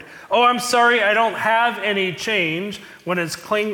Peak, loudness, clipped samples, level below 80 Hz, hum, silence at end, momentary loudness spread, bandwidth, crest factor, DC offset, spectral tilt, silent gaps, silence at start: -6 dBFS; -18 LUFS; under 0.1%; -64 dBFS; none; 0 s; 10 LU; 18 kHz; 14 dB; under 0.1%; -3 dB/octave; none; 0 s